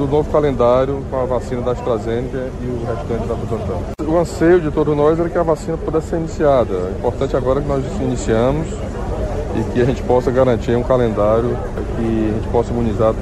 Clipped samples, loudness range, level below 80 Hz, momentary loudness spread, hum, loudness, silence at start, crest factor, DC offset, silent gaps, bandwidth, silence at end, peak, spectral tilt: under 0.1%; 3 LU; -28 dBFS; 8 LU; none; -18 LUFS; 0 s; 14 dB; under 0.1%; none; 12.5 kHz; 0 s; -2 dBFS; -7.5 dB/octave